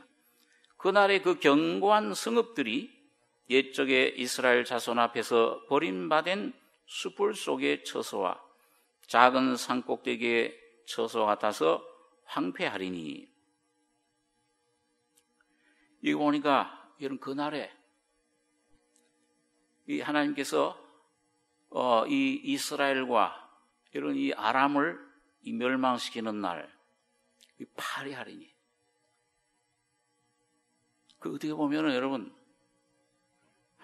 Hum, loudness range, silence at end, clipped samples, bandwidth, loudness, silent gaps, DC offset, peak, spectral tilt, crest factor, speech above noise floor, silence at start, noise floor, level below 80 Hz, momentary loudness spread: none; 13 LU; 1.55 s; under 0.1%; 13 kHz; -29 LUFS; none; under 0.1%; -4 dBFS; -4 dB/octave; 28 dB; 48 dB; 0.8 s; -76 dBFS; -84 dBFS; 15 LU